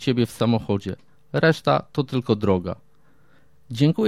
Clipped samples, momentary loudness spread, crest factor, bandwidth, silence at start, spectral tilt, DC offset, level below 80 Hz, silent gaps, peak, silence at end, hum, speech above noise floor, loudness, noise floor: under 0.1%; 14 LU; 18 dB; 15 kHz; 0 s; -7 dB/octave; 0.3%; -54 dBFS; none; -6 dBFS; 0 s; none; 38 dB; -23 LUFS; -60 dBFS